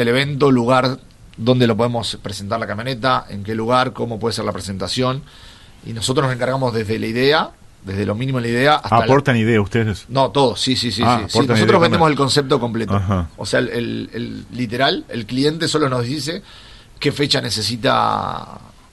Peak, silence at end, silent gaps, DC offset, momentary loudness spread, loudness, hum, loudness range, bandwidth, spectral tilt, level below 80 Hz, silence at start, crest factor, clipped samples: -2 dBFS; 0.3 s; none; under 0.1%; 12 LU; -18 LUFS; none; 5 LU; 12.5 kHz; -5 dB/octave; -42 dBFS; 0 s; 16 dB; under 0.1%